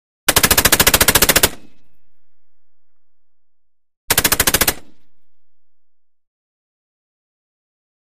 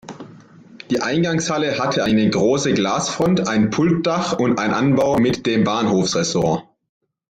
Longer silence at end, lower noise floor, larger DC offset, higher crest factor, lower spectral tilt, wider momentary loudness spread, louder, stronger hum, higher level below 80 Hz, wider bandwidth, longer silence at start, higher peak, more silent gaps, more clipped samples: first, 1.75 s vs 0.65 s; first, -55 dBFS vs -44 dBFS; first, 2% vs under 0.1%; first, 20 dB vs 14 dB; second, -1.5 dB/octave vs -5 dB/octave; first, 7 LU vs 3 LU; first, -12 LUFS vs -18 LUFS; neither; first, -34 dBFS vs -52 dBFS; first, over 20 kHz vs 9.6 kHz; first, 0.3 s vs 0.05 s; first, 0 dBFS vs -6 dBFS; first, 3.97-4.08 s vs none; neither